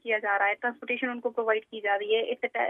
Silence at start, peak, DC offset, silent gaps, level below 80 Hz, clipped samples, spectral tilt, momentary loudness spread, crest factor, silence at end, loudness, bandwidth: 0.05 s; -12 dBFS; under 0.1%; none; -86 dBFS; under 0.1%; -5 dB/octave; 5 LU; 18 dB; 0 s; -28 LUFS; 3.8 kHz